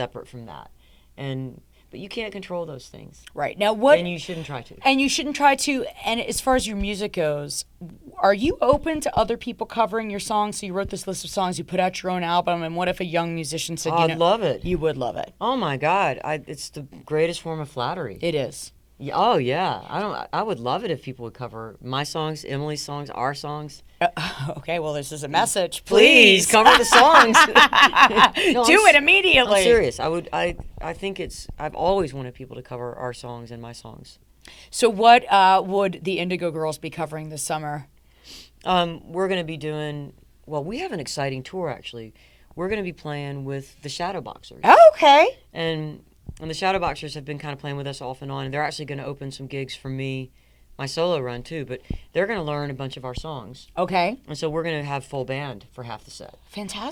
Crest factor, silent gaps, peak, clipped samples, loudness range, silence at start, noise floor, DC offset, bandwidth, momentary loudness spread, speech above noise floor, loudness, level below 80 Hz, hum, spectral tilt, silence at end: 20 dB; none; 0 dBFS; under 0.1%; 15 LU; 0 s; -46 dBFS; under 0.1%; over 20 kHz; 21 LU; 25 dB; -20 LUFS; -46 dBFS; none; -3.5 dB/octave; 0 s